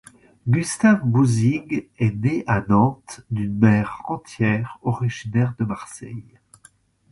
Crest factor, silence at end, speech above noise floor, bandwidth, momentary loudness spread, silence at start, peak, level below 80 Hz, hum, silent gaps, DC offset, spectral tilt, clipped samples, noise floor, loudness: 20 dB; 0.9 s; 34 dB; 11.5 kHz; 14 LU; 0.45 s; -2 dBFS; -50 dBFS; none; none; under 0.1%; -7 dB/octave; under 0.1%; -55 dBFS; -21 LUFS